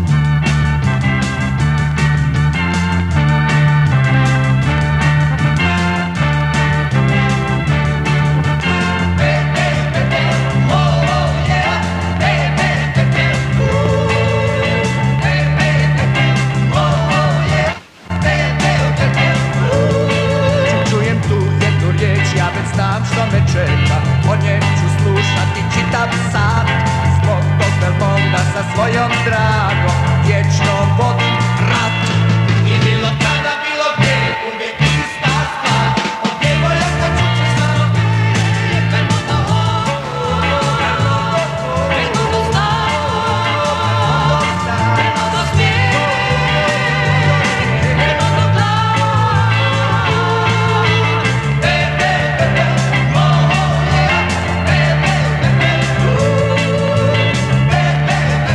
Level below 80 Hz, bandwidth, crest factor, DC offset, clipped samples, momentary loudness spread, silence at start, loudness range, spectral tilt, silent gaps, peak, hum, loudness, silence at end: -30 dBFS; 11 kHz; 14 dB; under 0.1%; under 0.1%; 3 LU; 0 s; 2 LU; -6 dB/octave; none; 0 dBFS; none; -14 LUFS; 0 s